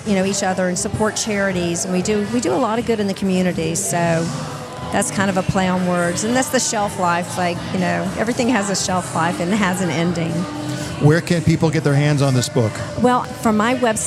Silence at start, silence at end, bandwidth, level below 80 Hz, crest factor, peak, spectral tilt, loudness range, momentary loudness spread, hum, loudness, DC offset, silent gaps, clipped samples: 0 s; 0 s; 15 kHz; -48 dBFS; 16 dB; -2 dBFS; -5 dB/octave; 2 LU; 5 LU; none; -19 LUFS; under 0.1%; none; under 0.1%